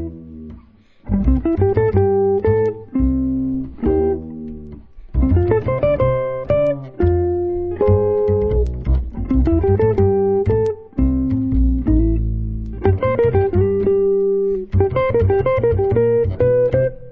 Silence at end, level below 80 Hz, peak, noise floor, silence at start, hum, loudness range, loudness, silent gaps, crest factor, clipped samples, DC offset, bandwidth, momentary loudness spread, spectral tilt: 0 s; -24 dBFS; -2 dBFS; -46 dBFS; 0 s; none; 3 LU; -18 LUFS; none; 14 dB; under 0.1%; under 0.1%; 4.6 kHz; 6 LU; -11.5 dB/octave